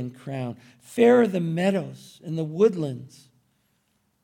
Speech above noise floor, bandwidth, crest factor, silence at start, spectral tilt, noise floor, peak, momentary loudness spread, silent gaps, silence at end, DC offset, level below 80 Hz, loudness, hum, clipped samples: 46 dB; 15.5 kHz; 18 dB; 0 s; -7 dB/octave; -70 dBFS; -6 dBFS; 21 LU; none; 1.15 s; under 0.1%; -70 dBFS; -23 LUFS; none; under 0.1%